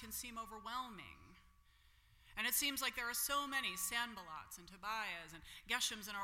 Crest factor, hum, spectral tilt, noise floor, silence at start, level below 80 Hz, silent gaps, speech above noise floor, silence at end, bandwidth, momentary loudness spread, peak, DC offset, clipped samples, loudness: 22 dB; none; 0 dB/octave; -69 dBFS; 0 s; -68 dBFS; none; 26 dB; 0 s; 16.5 kHz; 15 LU; -22 dBFS; under 0.1%; under 0.1%; -41 LUFS